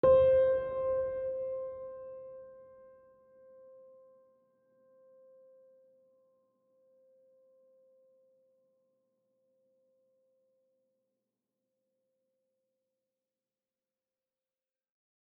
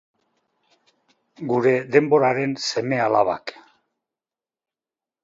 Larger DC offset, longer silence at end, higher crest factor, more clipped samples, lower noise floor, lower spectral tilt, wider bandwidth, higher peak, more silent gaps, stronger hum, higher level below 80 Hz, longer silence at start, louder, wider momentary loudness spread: neither; first, 12.75 s vs 1.7 s; about the same, 22 dB vs 22 dB; neither; about the same, under -90 dBFS vs under -90 dBFS; about the same, -6 dB/octave vs -5.5 dB/octave; second, 4 kHz vs 7.8 kHz; second, -16 dBFS vs 0 dBFS; neither; neither; about the same, -66 dBFS vs -68 dBFS; second, 0.05 s vs 1.4 s; second, -30 LUFS vs -20 LUFS; first, 26 LU vs 11 LU